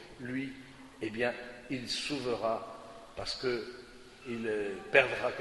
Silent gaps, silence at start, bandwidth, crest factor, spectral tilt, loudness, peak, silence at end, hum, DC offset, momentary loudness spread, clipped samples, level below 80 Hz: none; 0 s; 11.5 kHz; 28 dB; -4 dB/octave; -34 LUFS; -8 dBFS; 0 s; none; under 0.1%; 22 LU; under 0.1%; -62 dBFS